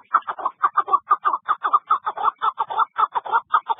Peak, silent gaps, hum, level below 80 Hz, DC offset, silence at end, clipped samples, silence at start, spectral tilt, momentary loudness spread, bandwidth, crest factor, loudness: -4 dBFS; none; none; -76 dBFS; under 0.1%; 0.05 s; under 0.1%; 0.1 s; -5.5 dB/octave; 4 LU; 3.9 kHz; 18 dB; -21 LUFS